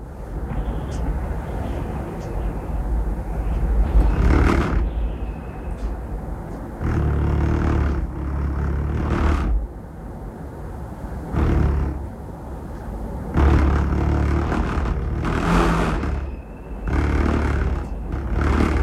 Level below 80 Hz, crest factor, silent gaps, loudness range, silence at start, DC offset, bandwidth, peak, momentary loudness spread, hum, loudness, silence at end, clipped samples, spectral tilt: -24 dBFS; 18 dB; none; 5 LU; 0 s; under 0.1%; 11 kHz; -4 dBFS; 15 LU; none; -23 LUFS; 0 s; under 0.1%; -8 dB/octave